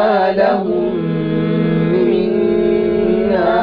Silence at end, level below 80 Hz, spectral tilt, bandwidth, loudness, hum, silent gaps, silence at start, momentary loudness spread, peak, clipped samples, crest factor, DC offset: 0 s; -40 dBFS; -10 dB/octave; 5.2 kHz; -15 LUFS; none; none; 0 s; 4 LU; -4 dBFS; under 0.1%; 10 dB; under 0.1%